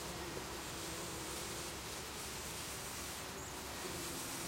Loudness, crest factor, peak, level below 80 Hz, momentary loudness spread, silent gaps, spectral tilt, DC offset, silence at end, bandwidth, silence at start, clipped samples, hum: -43 LUFS; 14 dB; -30 dBFS; -58 dBFS; 2 LU; none; -2.5 dB/octave; under 0.1%; 0 s; 16 kHz; 0 s; under 0.1%; none